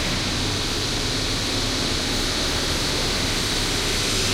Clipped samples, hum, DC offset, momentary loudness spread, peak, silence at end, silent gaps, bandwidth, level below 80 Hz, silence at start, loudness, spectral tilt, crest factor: under 0.1%; none; under 0.1%; 2 LU; -10 dBFS; 0 s; none; 16 kHz; -32 dBFS; 0 s; -22 LUFS; -2.5 dB/octave; 14 dB